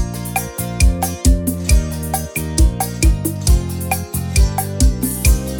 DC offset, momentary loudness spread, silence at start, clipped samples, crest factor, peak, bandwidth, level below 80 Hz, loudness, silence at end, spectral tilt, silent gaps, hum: under 0.1%; 5 LU; 0 s; under 0.1%; 14 dB; -2 dBFS; over 20 kHz; -18 dBFS; -18 LUFS; 0 s; -4.5 dB/octave; none; none